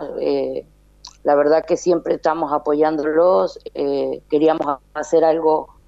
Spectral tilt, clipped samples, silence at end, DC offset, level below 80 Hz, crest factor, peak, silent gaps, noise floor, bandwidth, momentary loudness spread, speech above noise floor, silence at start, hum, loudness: -5.5 dB/octave; under 0.1%; 0.2 s; under 0.1%; -54 dBFS; 14 dB; -4 dBFS; none; -45 dBFS; 8 kHz; 9 LU; 27 dB; 0 s; none; -18 LUFS